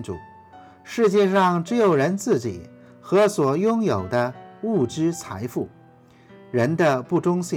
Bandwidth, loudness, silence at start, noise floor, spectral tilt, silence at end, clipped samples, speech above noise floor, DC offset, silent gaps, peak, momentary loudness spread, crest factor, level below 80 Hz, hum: 17 kHz; -22 LUFS; 0 s; -51 dBFS; -6.5 dB/octave; 0 s; under 0.1%; 30 dB; under 0.1%; none; -8 dBFS; 13 LU; 16 dB; -64 dBFS; none